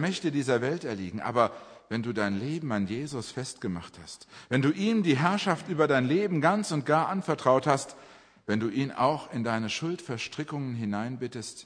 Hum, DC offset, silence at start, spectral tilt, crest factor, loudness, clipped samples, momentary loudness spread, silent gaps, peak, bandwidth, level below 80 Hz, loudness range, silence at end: none; under 0.1%; 0 s; -5.5 dB/octave; 22 dB; -28 LUFS; under 0.1%; 11 LU; none; -6 dBFS; 10.5 kHz; -68 dBFS; 6 LU; 0 s